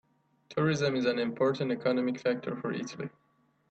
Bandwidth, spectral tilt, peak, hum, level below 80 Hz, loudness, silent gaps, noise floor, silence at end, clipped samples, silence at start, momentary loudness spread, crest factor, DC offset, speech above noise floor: 8.2 kHz; -6 dB/octave; -16 dBFS; none; -72 dBFS; -31 LUFS; none; -58 dBFS; 0.6 s; under 0.1%; 0.5 s; 10 LU; 16 dB; under 0.1%; 28 dB